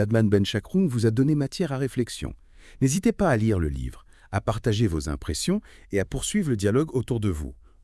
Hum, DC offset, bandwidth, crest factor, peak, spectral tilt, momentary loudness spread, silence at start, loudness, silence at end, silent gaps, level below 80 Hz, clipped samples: none; under 0.1%; 12 kHz; 16 dB; -8 dBFS; -6 dB/octave; 9 LU; 0 s; -25 LUFS; 0.3 s; none; -42 dBFS; under 0.1%